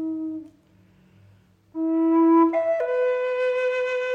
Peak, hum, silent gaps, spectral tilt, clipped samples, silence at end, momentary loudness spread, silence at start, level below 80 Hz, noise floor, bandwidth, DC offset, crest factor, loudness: -10 dBFS; none; none; -6 dB/octave; under 0.1%; 0 s; 14 LU; 0 s; -72 dBFS; -57 dBFS; 6.8 kHz; under 0.1%; 14 dB; -22 LUFS